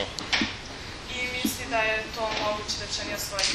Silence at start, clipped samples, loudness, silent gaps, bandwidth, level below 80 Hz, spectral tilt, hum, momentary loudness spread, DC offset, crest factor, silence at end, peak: 0 s; under 0.1%; -28 LUFS; none; 13.5 kHz; -46 dBFS; -2 dB/octave; none; 8 LU; under 0.1%; 20 dB; 0 s; -10 dBFS